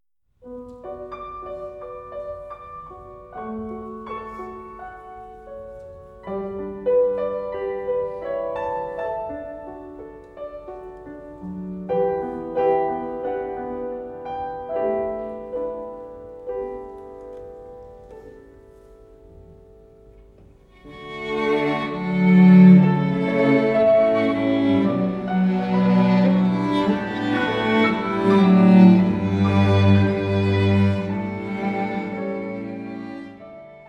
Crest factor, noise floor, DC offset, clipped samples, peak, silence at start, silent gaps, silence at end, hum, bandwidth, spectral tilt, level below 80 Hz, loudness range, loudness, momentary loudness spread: 20 dB; -50 dBFS; under 0.1%; under 0.1%; -2 dBFS; 0.45 s; none; 0.1 s; none; 5.8 kHz; -9 dB/octave; -52 dBFS; 19 LU; -20 LUFS; 22 LU